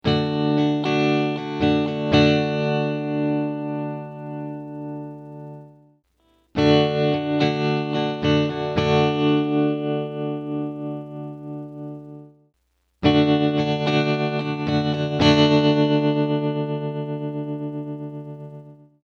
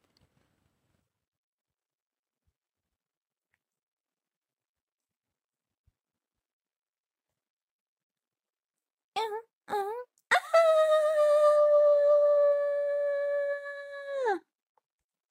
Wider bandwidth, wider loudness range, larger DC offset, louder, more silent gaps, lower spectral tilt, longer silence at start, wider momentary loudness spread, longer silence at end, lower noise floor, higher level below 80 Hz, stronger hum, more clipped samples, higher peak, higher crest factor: second, 7 kHz vs 12 kHz; second, 8 LU vs 16 LU; neither; first, -21 LUFS vs -26 LUFS; second, none vs 9.53-9.61 s; first, -7 dB/octave vs -1.5 dB/octave; second, 0.05 s vs 9.15 s; about the same, 17 LU vs 15 LU; second, 0.3 s vs 0.9 s; second, -69 dBFS vs under -90 dBFS; first, -54 dBFS vs -86 dBFS; neither; neither; first, -2 dBFS vs -12 dBFS; about the same, 20 dB vs 20 dB